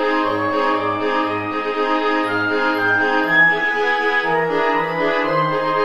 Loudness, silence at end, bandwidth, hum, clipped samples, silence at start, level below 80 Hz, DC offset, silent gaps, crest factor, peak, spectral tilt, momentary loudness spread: -17 LUFS; 0 s; 13 kHz; none; under 0.1%; 0 s; -52 dBFS; 0.8%; none; 14 dB; -4 dBFS; -5.5 dB/octave; 5 LU